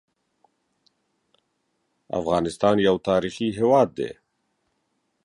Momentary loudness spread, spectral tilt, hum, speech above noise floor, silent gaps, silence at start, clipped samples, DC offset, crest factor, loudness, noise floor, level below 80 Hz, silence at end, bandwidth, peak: 12 LU; -6 dB/octave; none; 52 dB; none; 2.15 s; under 0.1%; under 0.1%; 20 dB; -22 LUFS; -74 dBFS; -56 dBFS; 1.15 s; 11.5 kHz; -6 dBFS